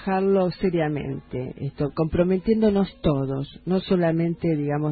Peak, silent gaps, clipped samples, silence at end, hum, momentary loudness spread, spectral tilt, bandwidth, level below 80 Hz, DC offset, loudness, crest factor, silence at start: -6 dBFS; none; under 0.1%; 0 s; none; 10 LU; -12.5 dB/octave; 4.8 kHz; -44 dBFS; under 0.1%; -24 LUFS; 16 dB; 0 s